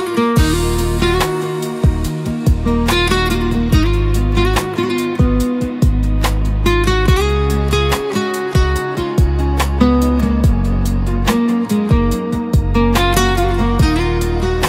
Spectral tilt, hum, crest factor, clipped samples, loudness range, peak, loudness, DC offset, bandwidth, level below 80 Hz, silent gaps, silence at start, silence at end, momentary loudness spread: -6 dB/octave; none; 14 dB; under 0.1%; 1 LU; 0 dBFS; -16 LUFS; under 0.1%; 16.5 kHz; -18 dBFS; none; 0 s; 0 s; 4 LU